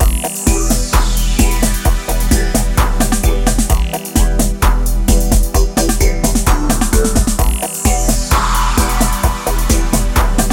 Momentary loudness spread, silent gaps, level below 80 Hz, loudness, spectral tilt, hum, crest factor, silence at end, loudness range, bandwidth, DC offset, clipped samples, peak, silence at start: 2 LU; none; -14 dBFS; -15 LUFS; -4.5 dB/octave; none; 12 dB; 0 s; 1 LU; 18 kHz; under 0.1%; under 0.1%; 0 dBFS; 0 s